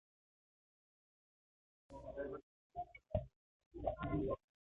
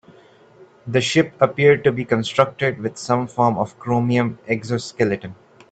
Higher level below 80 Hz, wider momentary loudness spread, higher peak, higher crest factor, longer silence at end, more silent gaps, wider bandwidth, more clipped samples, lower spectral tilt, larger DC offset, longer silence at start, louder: about the same, -58 dBFS vs -56 dBFS; first, 16 LU vs 10 LU; second, -24 dBFS vs 0 dBFS; about the same, 24 dB vs 20 dB; about the same, 0.35 s vs 0.35 s; first, 2.43-2.70 s, 3.36-3.60 s, 3.66-3.71 s vs none; second, 7.6 kHz vs 9 kHz; neither; first, -8 dB/octave vs -6 dB/octave; neither; first, 1.9 s vs 0.6 s; second, -46 LUFS vs -20 LUFS